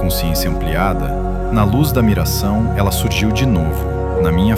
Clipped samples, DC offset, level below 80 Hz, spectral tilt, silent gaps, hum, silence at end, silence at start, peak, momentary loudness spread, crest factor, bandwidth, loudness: under 0.1%; under 0.1%; -22 dBFS; -6 dB/octave; none; none; 0 s; 0 s; 0 dBFS; 5 LU; 14 dB; 17 kHz; -16 LUFS